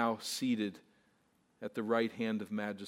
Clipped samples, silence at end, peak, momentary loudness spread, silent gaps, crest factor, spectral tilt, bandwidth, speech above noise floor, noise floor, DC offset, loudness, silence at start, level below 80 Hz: under 0.1%; 0 s; -16 dBFS; 8 LU; none; 20 dB; -4.5 dB/octave; 16 kHz; 37 dB; -73 dBFS; under 0.1%; -36 LUFS; 0 s; -86 dBFS